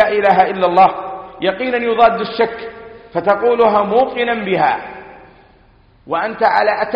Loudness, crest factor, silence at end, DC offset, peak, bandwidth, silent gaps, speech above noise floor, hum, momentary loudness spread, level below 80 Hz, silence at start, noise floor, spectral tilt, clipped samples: -15 LUFS; 16 dB; 0 s; under 0.1%; 0 dBFS; 5.4 kHz; none; 35 dB; none; 13 LU; -50 dBFS; 0 s; -49 dBFS; -7.5 dB/octave; under 0.1%